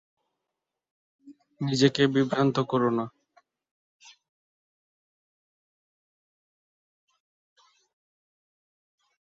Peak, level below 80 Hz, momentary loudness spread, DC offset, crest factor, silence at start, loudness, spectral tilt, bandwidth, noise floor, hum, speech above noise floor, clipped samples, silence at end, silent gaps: -8 dBFS; -70 dBFS; 11 LU; under 0.1%; 24 dB; 1.25 s; -25 LUFS; -6 dB/octave; 7.8 kHz; -86 dBFS; none; 62 dB; under 0.1%; 6.2 s; none